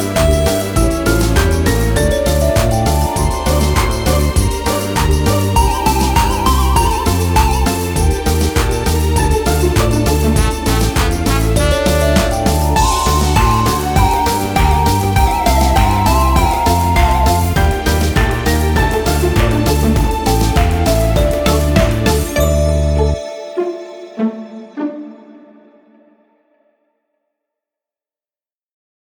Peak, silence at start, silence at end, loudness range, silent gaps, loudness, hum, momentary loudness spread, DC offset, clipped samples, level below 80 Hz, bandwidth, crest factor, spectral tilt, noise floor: 0 dBFS; 0 s; 3.8 s; 6 LU; none; -14 LUFS; none; 4 LU; under 0.1%; under 0.1%; -18 dBFS; over 20 kHz; 14 dB; -5 dB/octave; under -90 dBFS